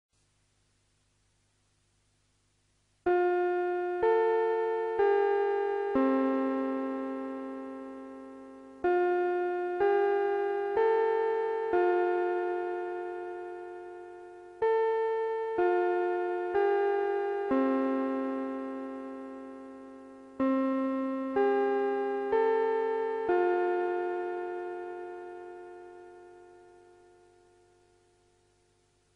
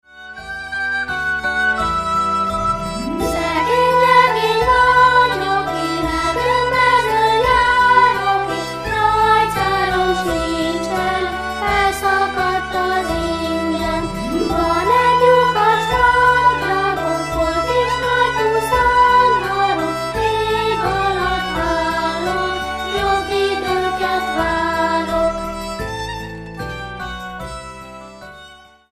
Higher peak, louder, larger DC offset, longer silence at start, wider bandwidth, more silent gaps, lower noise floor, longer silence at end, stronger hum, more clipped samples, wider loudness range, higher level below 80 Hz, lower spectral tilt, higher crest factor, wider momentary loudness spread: second, -16 dBFS vs 0 dBFS; second, -30 LUFS vs -16 LUFS; neither; first, 3.05 s vs 0.15 s; second, 5.6 kHz vs 15.5 kHz; neither; first, -72 dBFS vs -43 dBFS; first, 2.6 s vs 0.35 s; first, 50 Hz at -75 dBFS vs none; neither; about the same, 6 LU vs 5 LU; second, -70 dBFS vs -36 dBFS; first, -6.5 dB/octave vs -4.5 dB/octave; about the same, 14 dB vs 16 dB; first, 18 LU vs 13 LU